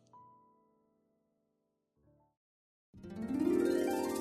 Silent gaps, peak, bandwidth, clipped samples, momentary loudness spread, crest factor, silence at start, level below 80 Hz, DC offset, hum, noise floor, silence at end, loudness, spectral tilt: 2.37-2.93 s; -20 dBFS; 13.5 kHz; under 0.1%; 18 LU; 18 dB; 0.15 s; -72 dBFS; under 0.1%; none; -83 dBFS; 0 s; -34 LUFS; -5.5 dB/octave